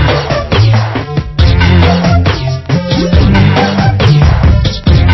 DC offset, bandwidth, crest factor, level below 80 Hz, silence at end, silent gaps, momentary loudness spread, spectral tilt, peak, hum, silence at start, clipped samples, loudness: under 0.1%; 6 kHz; 8 dB; -14 dBFS; 0 s; none; 6 LU; -7 dB/octave; 0 dBFS; none; 0 s; 0.5%; -9 LUFS